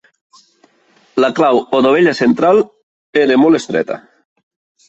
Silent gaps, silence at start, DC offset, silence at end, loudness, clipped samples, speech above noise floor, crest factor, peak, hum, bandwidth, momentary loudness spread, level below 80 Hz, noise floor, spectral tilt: 2.83-3.13 s; 1.15 s; under 0.1%; 0.9 s; -13 LUFS; under 0.1%; 42 dB; 14 dB; -2 dBFS; none; 8.4 kHz; 12 LU; -58 dBFS; -53 dBFS; -5.5 dB/octave